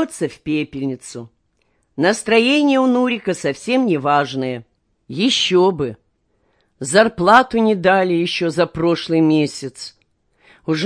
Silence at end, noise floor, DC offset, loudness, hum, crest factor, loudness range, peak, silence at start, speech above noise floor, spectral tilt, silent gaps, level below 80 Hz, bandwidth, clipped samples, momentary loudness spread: 0 s; -65 dBFS; under 0.1%; -17 LUFS; none; 18 dB; 3 LU; 0 dBFS; 0 s; 48 dB; -4.5 dB/octave; none; -54 dBFS; 10.5 kHz; under 0.1%; 17 LU